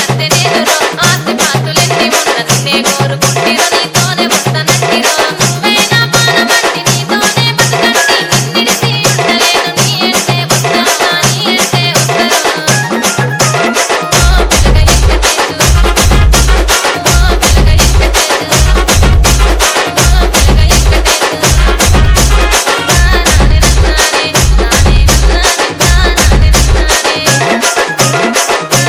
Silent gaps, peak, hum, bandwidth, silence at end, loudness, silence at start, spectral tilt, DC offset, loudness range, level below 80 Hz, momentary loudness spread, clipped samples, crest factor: none; 0 dBFS; none; over 20 kHz; 0 s; -8 LUFS; 0 s; -3 dB/octave; under 0.1%; 1 LU; -12 dBFS; 2 LU; 2%; 8 dB